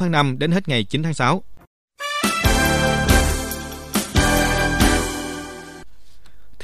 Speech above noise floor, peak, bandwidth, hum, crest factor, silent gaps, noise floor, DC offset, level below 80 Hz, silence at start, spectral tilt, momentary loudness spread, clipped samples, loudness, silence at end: 28 dB; -2 dBFS; 15.5 kHz; none; 18 dB; 1.67-1.88 s; -48 dBFS; under 0.1%; -28 dBFS; 0 s; -4 dB/octave; 13 LU; under 0.1%; -19 LUFS; 0 s